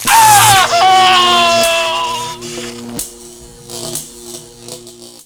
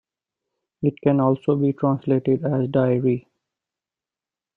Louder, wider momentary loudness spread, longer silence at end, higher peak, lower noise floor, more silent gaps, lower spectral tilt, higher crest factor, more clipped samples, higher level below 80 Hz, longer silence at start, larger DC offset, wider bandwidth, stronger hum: first, -9 LUFS vs -21 LUFS; first, 24 LU vs 5 LU; second, 0.15 s vs 1.35 s; first, 0 dBFS vs -6 dBFS; second, -35 dBFS vs under -90 dBFS; neither; second, -1 dB/octave vs -11.5 dB/octave; second, 12 dB vs 18 dB; first, 0.1% vs under 0.1%; first, -44 dBFS vs -62 dBFS; second, 0 s vs 0.8 s; neither; first, over 20 kHz vs 4 kHz; neither